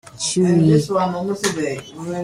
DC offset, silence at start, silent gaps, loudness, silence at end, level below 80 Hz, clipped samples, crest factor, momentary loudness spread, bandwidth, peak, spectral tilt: under 0.1%; 0.05 s; none; -18 LUFS; 0 s; -52 dBFS; under 0.1%; 16 dB; 12 LU; 14 kHz; -2 dBFS; -5.5 dB/octave